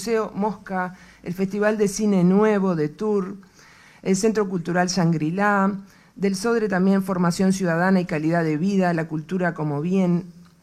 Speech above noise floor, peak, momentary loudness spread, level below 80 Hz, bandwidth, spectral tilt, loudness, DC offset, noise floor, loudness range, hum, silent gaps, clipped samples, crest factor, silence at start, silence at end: 29 dB; -6 dBFS; 8 LU; -56 dBFS; 13.5 kHz; -6.5 dB/octave; -22 LUFS; under 0.1%; -50 dBFS; 2 LU; none; none; under 0.1%; 16 dB; 0 s; 0.25 s